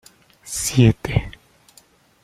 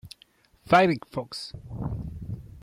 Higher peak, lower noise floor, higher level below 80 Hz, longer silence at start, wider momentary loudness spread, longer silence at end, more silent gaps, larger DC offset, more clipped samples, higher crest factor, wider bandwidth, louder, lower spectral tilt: first, -2 dBFS vs -8 dBFS; second, -54 dBFS vs -60 dBFS; first, -38 dBFS vs -48 dBFS; first, 0.45 s vs 0.05 s; second, 14 LU vs 18 LU; first, 0.95 s vs 0 s; neither; neither; neither; about the same, 20 dB vs 20 dB; about the same, 15.5 kHz vs 15 kHz; first, -19 LUFS vs -26 LUFS; about the same, -5.5 dB/octave vs -6 dB/octave